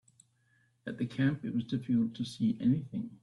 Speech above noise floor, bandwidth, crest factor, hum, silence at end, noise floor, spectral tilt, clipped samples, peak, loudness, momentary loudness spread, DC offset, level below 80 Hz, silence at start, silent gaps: 39 dB; 11.5 kHz; 16 dB; none; 0.1 s; -71 dBFS; -7.5 dB/octave; under 0.1%; -18 dBFS; -33 LUFS; 9 LU; under 0.1%; -68 dBFS; 0.85 s; none